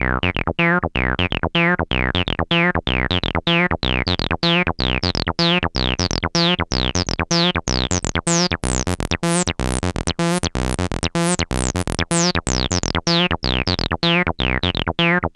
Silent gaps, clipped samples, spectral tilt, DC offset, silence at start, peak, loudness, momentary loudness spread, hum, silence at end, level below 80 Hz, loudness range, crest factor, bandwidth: none; under 0.1%; -4 dB/octave; under 0.1%; 0 s; 0 dBFS; -19 LUFS; 4 LU; none; 0.05 s; -30 dBFS; 2 LU; 18 dB; 12 kHz